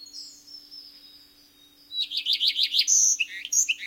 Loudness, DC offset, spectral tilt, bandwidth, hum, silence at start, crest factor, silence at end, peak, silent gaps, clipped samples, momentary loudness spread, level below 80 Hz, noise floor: -21 LUFS; under 0.1%; 6 dB/octave; 16.5 kHz; none; 0 s; 20 dB; 0 s; -6 dBFS; none; under 0.1%; 24 LU; -76 dBFS; -56 dBFS